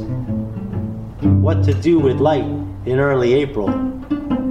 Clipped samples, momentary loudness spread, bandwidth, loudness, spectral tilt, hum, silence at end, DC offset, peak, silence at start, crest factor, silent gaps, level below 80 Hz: under 0.1%; 10 LU; 7.4 kHz; -18 LUFS; -9 dB/octave; none; 0 s; under 0.1%; -4 dBFS; 0 s; 14 dB; none; -38 dBFS